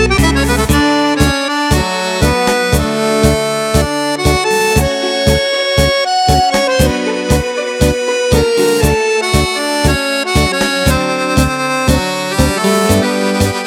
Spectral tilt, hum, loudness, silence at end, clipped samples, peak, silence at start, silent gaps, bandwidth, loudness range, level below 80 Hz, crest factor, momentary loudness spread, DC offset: -4.5 dB/octave; none; -13 LUFS; 0 s; under 0.1%; 0 dBFS; 0 s; none; 17.5 kHz; 1 LU; -22 dBFS; 12 dB; 3 LU; under 0.1%